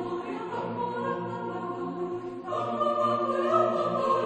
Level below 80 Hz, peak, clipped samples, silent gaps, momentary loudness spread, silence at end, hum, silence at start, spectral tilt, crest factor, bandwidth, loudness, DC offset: -70 dBFS; -10 dBFS; under 0.1%; none; 9 LU; 0 s; none; 0 s; -7 dB/octave; 18 dB; 9.2 kHz; -29 LUFS; under 0.1%